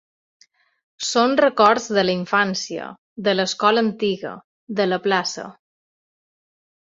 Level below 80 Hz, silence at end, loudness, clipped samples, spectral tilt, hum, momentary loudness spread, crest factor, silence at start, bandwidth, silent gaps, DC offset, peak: -66 dBFS; 1.35 s; -20 LUFS; under 0.1%; -4 dB/octave; none; 16 LU; 20 dB; 1 s; 8 kHz; 2.98-3.16 s, 4.44-4.67 s; under 0.1%; -2 dBFS